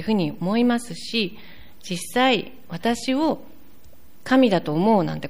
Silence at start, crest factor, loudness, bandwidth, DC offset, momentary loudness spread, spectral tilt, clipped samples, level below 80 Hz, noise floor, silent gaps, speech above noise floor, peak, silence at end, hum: 0 s; 16 dB; -22 LUFS; 15.5 kHz; 1%; 13 LU; -5.5 dB/octave; under 0.1%; -56 dBFS; -53 dBFS; none; 31 dB; -8 dBFS; 0 s; none